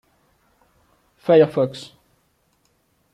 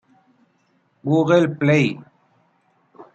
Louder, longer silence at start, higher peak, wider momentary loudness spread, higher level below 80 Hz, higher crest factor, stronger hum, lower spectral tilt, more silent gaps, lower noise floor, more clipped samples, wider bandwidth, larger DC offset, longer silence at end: about the same, -18 LUFS vs -18 LUFS; first, 1.3 s vs 1.05 s; about the same, -4 dBFS vs -4 dBFS; first, 23 LU vs 14 LU; about the same, -66 dBFS vs -64 dBFS; about the same, 20 dB vs 18 dB; neither; about the same, -7.5 dB/octave vs -7.5 dB/octave; neither; about the same, -65 dBFS vs -64 dBFS; neither; first, 10.5 kHz vs 8.2 kHz; neither; first, 1.3 s vs 0.1 s